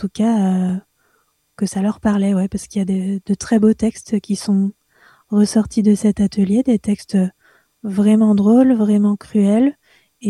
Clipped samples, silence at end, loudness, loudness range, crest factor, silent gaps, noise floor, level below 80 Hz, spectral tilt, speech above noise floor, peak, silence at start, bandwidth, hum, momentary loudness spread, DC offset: under 0.1%; 0 s; -17 LUFS; 4 LU; 14 dB; none; -63 dBFS; -48 dBFS; -7 dB/octave; 47 dB; -4 dBFS; 0 s; 12 kHz; none; 10 LU; under 0.1%